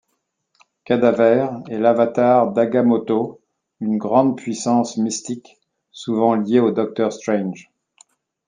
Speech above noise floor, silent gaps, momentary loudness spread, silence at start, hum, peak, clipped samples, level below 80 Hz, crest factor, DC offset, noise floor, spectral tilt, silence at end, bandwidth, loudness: 55 dB; none; 12 LU; 0.9 s; none; -2 dBFS; under 0.1%; -68 dBFS; 18 dB; under 0.1%; -73 dBFS; -6 dB/octave; 0.85 s; 9.6 kHz; -18 LUFS